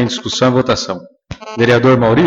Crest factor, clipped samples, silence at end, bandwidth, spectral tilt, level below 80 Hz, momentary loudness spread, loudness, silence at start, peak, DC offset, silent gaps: 14 dB; under 0.1%; 0 s; 8 kHz; -5.5 dB/octave; -42 dBFS; 18 LU; -13 LUFS; 0 s; 0 dBFS; under 0.1%; none